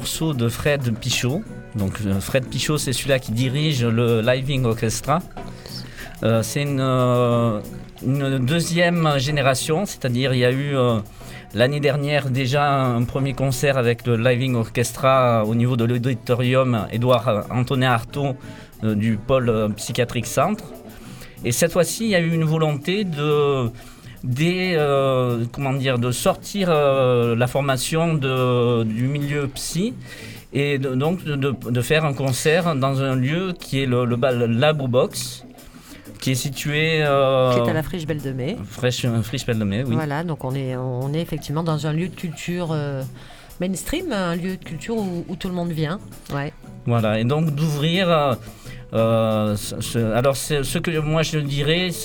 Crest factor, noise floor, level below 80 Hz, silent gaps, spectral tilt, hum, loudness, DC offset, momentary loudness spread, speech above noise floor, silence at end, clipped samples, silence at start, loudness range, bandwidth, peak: 18 dB; -42 dBFS; -42 dBFS; none; -5.5 dB/octave; none; -21 LUFS; under 0.1%; 10 LU; 21 dB; 0 s; under 0.1%; 0 s; 5 LU; 19 kHz; -2 dBFS